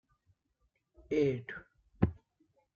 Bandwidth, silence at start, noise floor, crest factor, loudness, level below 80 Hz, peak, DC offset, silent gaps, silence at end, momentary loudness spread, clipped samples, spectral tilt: 7 kHz; 1.1 s; -78 dBFS; 26 dB; -34 LUFS; -56 dBFS; -12 dBFS; under 0.1%; none; 0.65 s; 15 LU; under 0.1%; -7.5 dB/octave